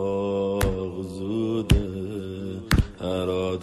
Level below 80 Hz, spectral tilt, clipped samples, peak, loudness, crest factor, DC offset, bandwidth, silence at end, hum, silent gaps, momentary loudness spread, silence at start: -32 dBFS; -6.5 dB/octave; under 0.1%; -6 dBFS; -26 LUFS; 20 dB; under 0.1%; 14.5 kHz; 0 s; none; none; 9 LU; 0 s